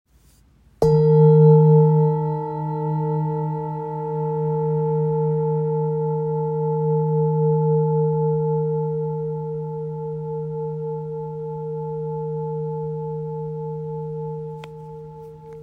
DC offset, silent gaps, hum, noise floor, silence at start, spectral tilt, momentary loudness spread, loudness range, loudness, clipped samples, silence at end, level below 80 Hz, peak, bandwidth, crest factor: under 0.1%; none; none; -55 dBFS; 0.8 s; -11.5 dB/octave; 15 LU; 11 LU; -21 LUFS; under 0.1%; 0 s; -54 dBFS; -4 dBFS; 5.2 kHz; 18 dB